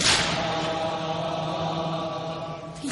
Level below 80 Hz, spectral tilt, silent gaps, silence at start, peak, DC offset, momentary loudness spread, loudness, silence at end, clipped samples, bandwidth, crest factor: -50 dBFS; -3 dB/octave; none; 0 s; -8 dBFS; under 0.1%; 11 LU; -27 LUFS; 0 s; under 0.1%; 11.5 kHz; 20 dB